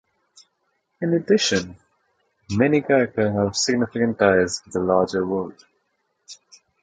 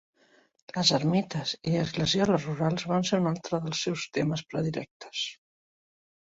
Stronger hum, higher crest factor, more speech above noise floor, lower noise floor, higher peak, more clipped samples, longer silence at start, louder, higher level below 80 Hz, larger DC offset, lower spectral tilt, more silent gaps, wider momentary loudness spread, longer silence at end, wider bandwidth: neither; about the same, 20 dB vs 20 dB; first, 51 dB vs 36 dB; first, -72 dBFS vs -64 dBFS; first, -4 dBFS vs -10 dBFS; neither; first, 1 s vs 0.75 s; first, -21 LUFS vs -28 LUFS; first, -52 dBFS vs -62 dBFS; neither; about the same, -4.5 dB/octave vs -5 dB/octave; second, none vs 4.91-5.00 s; about the same, 10 LU vs 9 LU; second, 0.5 s vs 1 s; first, 9.4 kHz vs 8 kHz